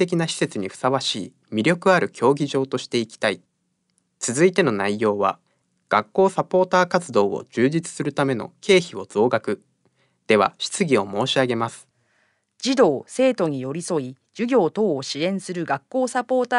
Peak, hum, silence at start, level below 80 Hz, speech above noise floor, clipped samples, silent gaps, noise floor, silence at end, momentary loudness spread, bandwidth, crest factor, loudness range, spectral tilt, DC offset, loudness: -4 dBFS; none; 0 s; -70 dBFS; 51 dB; under 0.1%; none; -72 dBFS; 0 s; 9 LU; 11.5 kHz; 18 dB; 2 LU; -4.5 dB/octave; under 0.1%; -22 LUFS